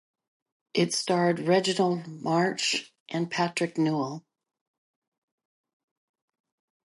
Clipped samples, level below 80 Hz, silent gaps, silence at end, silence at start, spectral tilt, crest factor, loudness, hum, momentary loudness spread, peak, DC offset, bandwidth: under 0.1%; -78 dBFS; 3.00-3.06 s; 2.65 s; 0.75 s; -4.5 dB/octave; 20 dB; -27 LUFS; none; 8 LU; -10 dBFS; under 0.1%; 11.5 kHz